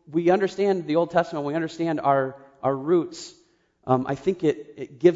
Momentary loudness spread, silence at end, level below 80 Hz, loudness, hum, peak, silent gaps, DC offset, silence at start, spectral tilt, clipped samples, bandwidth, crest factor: 12 LU; 0 s; -64 dBFS; -24 LUFS; none; -4 dBFS; none; under 0.1%; 0.1 s; -7 dB/octave; under 0.1%; 7.8 kHz; 18 dB